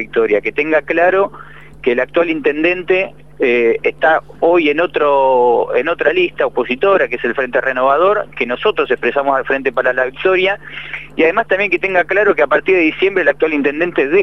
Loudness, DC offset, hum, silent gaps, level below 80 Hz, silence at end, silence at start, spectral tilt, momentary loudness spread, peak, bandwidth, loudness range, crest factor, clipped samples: -14 LUFS; 1%; none; none; -48 dBFS; 0 s; 0 s; -6.5 dB/octave; 5 LU; 0 dBFS; 6.6 kHz; 2 LU; 14 dB; under 0.1%